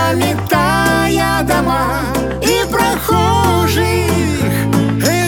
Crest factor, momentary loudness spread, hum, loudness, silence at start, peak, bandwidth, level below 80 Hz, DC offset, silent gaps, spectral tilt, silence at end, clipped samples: 14 dB; 3 LU; none; -14 LUFS; 0 s; 0 dBFS; over 20 kHz; -30 dBFS; under 0.1%; none; -5 dB/octave; 0 s; under 0.1%